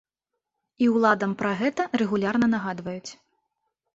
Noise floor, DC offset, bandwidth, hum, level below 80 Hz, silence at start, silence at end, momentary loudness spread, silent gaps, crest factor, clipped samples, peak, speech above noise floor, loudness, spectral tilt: -84 dBFS; under 0.1%; 8 kHz; none; -64 dBFS; 0.8 s; 0.85 s; 13 LU; none; 20 dB; under 0.1%; -6 dBFS; 60 dB; -24 LUFS; -6 dB/octave